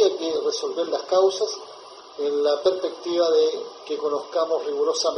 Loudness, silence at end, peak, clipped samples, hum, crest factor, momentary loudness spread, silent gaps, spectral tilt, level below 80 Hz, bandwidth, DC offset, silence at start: -23 LUFS; 0 s; -8 dBFS; under 0.1%; none; 16 dB; 12 LU; none; -2 dB/octave; -74 dBFS; 10.5 kHz; under 0.1%; 0 s